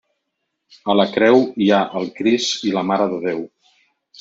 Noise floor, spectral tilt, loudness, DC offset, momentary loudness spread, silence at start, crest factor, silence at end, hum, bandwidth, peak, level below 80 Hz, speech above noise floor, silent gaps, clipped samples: -76 dBFS; -4.5 dB/octave; -18 LUFS; under 0.1%; 11 LU; 0.85 s; 16 dB; 0.75 s; none; 7.8 kHz; -2 dBFS; -64 dBFS; 58 dB; none; under 0.1%